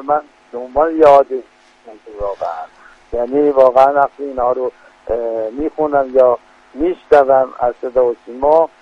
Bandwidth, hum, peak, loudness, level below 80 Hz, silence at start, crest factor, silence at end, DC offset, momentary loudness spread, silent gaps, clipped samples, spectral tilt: 7.6 kHz; none; 0 dBFS; -15 LUFS; -44 dBFS; 0 s; 14 dB; 0.15 s; under 0.1%; 15 LU; none; under 0.1%; -7 dB/octave